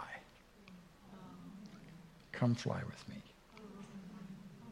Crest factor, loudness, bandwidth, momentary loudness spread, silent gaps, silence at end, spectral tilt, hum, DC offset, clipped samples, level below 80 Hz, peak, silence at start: 22 dB; -43 LUFS; 12 kHz; 22 LU; none; 0 s; -6.5 dB/octave; none; under 0.1%; under 0.1%; -70 dBFS; -22 dBFS; 0 s